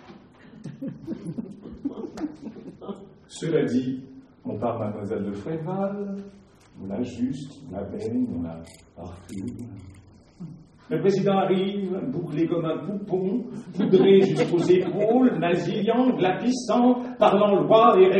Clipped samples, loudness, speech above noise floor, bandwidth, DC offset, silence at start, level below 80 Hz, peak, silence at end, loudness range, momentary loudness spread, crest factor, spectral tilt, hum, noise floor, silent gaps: under 0.1%; -23 LUFS; 25 dB; 10 kHz; under 0.1%; 0.1 s; -60 dBFS; -4 dBFS; 0 s; 12 LU; 22 LU; 20 dB; -7 dB/octave; none; -48 dBFS; none